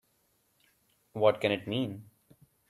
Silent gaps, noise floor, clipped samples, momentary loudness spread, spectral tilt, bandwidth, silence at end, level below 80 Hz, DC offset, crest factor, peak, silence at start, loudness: none; -73 dBFS; under 0.1%; 18 LU; -6.5 dB/octave; 14 kHz; 0.65 s; -72 dBFS; under 0.1%; 24 dB; -10 dBFS; 1.15 s; -30 LUFS